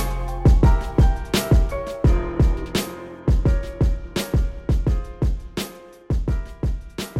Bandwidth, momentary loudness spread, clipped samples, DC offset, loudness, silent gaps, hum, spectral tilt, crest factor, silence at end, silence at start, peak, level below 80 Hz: 15.5 kHz; 9 LU; under 0.1%; under 0.1%; -22 LUFS; none; none; -6.5 dB/octave; 14 dB; 0 s; 0 s; -6 dBFS; -22 dBFS